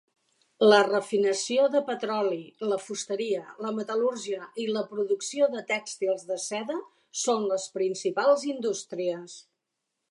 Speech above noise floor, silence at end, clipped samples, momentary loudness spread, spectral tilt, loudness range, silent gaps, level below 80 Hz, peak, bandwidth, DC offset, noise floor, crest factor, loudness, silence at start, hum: 56 dB; 0.7 s; under 0.1%; 9 LU; -3 dB/octave; 5 LU; none; -84 dBFS; -6 dBFS; 11.5 kHz; under 0.1%; -83 dBFS; 20 dB; -27 LUFS; 0.6 s; none